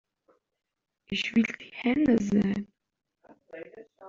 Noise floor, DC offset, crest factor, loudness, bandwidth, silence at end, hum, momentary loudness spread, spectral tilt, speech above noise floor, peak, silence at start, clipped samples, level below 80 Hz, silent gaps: -69 dBFS; under 0.1%; 18 dB; -27 LUFS; 7.6 kHz; 0 s; none; 22 LU; -5 dB/octave; 42 dB; -12 dBFS; 1.1 s; under 0.1%; -60 dBFS; none